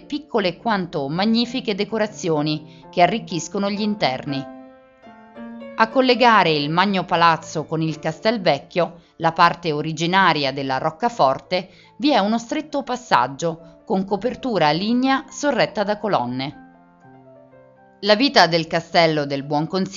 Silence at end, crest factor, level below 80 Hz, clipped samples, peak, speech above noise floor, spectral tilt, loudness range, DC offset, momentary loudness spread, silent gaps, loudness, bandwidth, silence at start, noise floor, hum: 0 s; 20 dB; -58 dBFS; under 0.1%; 0 dBFS; 29 dB; -3 dB/octave; 4 LU; under 0.1%; 10 LU; none; -20 LUFS; 7.8 kHz; 0.1 s; -49 dBFS; none